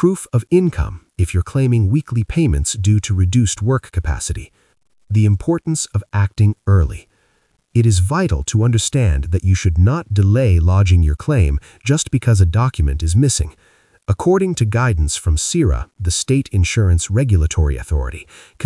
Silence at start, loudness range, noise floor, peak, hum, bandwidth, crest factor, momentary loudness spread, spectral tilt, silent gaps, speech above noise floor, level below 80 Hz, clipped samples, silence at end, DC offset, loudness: 0 s; 3 LU; -61 dBFS; -2 dBFS; none; 12 kHz; 14 dB; 8 LU; -6 dB/octave; none; 46 dB; -26 dBFS; under 0.1%; 0 s; under 0.1%; -17 LUFS